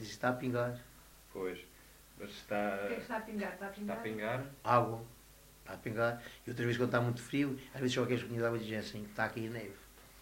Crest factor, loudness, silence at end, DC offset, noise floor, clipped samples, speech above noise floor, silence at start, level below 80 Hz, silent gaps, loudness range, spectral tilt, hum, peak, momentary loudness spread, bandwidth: 22 dB; -37 LUFS; 0 s; under 0.1%; -59 dBFS; under 0.1%; 23 dB; 0 s; -64 dBFS; none; 5 LU; -6 dB/octave; none; -14 dBFS; 17 LU; 16 kHz